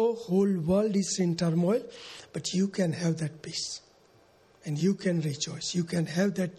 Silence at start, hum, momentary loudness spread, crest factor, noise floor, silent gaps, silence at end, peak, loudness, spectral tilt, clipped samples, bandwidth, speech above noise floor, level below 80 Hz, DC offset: 0 s; none; 10 LU; 14 dB; -60 dBFS; none; 0 s; -14 dBFS; -29 LUFS; -5.5 dB/octave; under 0.1%; 12.5 kHz; 32 dB; -62 dBFS; under 0.1%